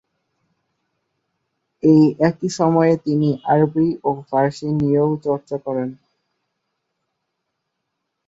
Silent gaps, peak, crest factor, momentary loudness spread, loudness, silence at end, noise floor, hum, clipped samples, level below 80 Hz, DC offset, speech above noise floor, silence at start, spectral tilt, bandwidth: none; -2 dBFS; 18 dB; 10 LU; -18 LUFS; 2.35 s; -77 dBFS; none; under 0.1%; -58 dBFS; under 0.1%; 59 dB; 1.85 s; -8 dB/octave; 7.8 kHz